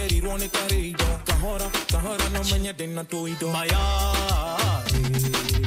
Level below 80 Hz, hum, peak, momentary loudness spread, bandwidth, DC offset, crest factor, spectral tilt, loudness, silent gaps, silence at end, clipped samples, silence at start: -28 dBFS; none; -6 dBFS; 5 LU; 16 kHz; under 0.1%; 18 dB; -4 dB/octave; -25 LUFS; none; 0 s; under 0.1%; 0 s